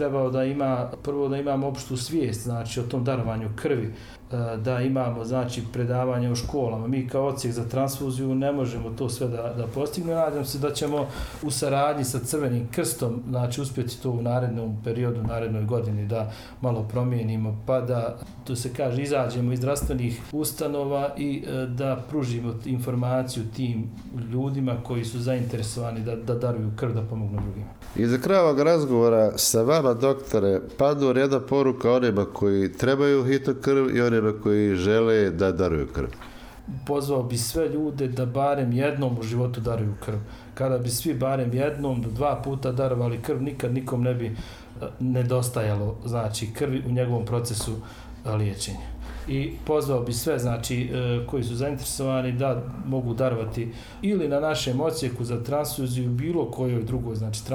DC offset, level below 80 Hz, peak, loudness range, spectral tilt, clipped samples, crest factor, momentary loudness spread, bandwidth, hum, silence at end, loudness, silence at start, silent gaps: under 0.1%; -46 dBFS; -10 dBFS; 6 LU; -6 dB/octave; under 0.1%; 16 dB; 9 LU; 18 kHz; none; 0 s; -26 LUFS; 0 s; none